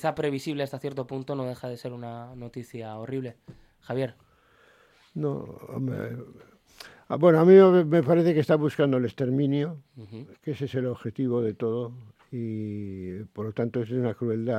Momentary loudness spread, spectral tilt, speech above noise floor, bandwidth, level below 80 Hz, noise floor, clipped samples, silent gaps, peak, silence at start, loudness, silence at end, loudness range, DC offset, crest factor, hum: 18 LU; -8.5 dB/octave; 35 dB; 13.5 kHz; -66 dBFS; -60 dBFS; under 0.1%; none; -4 dBFS; 0 s; -25 LUFS; 0 s; 15 LU; under 0.1%; 22 dB; none